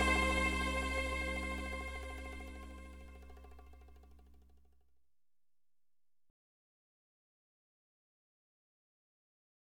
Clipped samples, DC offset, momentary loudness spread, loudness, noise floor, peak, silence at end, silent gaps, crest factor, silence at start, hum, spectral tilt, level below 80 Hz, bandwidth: under 0.1%; under 0.1%; 24 LU; -37 LUFS; under -90 dBFS; -20 dBFS; 5.25 s; none; 22 dB; 0 s; none; -4.5 dB/octave; -48 dBFS; 16 kHz